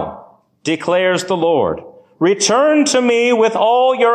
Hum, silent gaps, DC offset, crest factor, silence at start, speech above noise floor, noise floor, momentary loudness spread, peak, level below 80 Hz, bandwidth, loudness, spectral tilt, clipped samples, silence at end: none; none; under 0.1%; 12 dB; 0 s; 29 dB; -42 dBFS; 9 LU; -2 dBFS; -54 dBFS; 13.5 kHz; -14 LUFS; -3.5 dB/octave; under 0.1%; 0 s